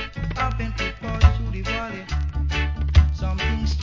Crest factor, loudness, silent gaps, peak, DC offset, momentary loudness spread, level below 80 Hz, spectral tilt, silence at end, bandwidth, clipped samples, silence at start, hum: 20 dB; -23 LUFS; none; -2 dBFS; 0.2%; 8 LU; -22 dBFS; -6 dB/octave; 0 s; 7.4 kHz; under 0.1%; 0 s; none